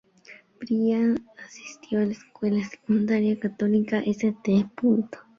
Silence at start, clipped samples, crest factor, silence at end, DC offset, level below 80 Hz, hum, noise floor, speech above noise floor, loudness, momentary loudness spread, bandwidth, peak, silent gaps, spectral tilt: 0.3 s; under 0.1%; 14 dB; 0.2 s; under 0.1%; -66 dBFS; none; -51 dBFS; 27 dB; -25 LUFS; 12 LU; 7.2 kHz; -12 dBFS; none; -7.5 dB/octave